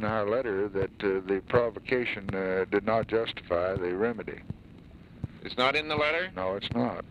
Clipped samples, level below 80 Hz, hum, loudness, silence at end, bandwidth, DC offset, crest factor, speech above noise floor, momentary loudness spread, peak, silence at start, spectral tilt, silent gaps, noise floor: under 0.1%; -54 dBFS; none; -29 LUFS; 0 s; 10.5 kHz; under 0.1%; 18 dB; 21 dB; 13 LU; -10 dBFS; 0 s; -6.5 dB/octave; none; -50 dBFS